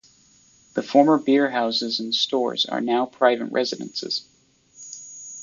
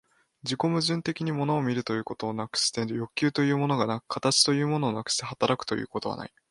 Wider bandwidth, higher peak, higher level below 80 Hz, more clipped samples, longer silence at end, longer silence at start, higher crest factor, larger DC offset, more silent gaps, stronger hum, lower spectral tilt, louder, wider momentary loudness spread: second, 7.6 kHz vs 11.5 kHz; first, -2 dBFS vs -6 dBFS; second, -72 dBFS vs -66 dBFS; neither; second, 0 s vs 0.25 s; first, 0.75 s vs 0.45 s; about the same, 20 dB vs 20 dB; neither; neither; neither; about the same, -3.5 dB/octave vs -4 dB/octave; first, -22 LUFS vs -27 LUFS; first, 19 LU vs 10 LU